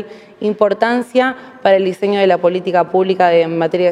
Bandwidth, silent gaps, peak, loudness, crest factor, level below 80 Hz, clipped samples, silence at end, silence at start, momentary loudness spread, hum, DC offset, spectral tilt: 11.5 kHz; none; 0 dBFS; -15 LUFS; 14 dB; -64 dBFS; under 0.1%; 0 s; 0 s; 7 LU; none; under 0.1%; -6.5 dB/octave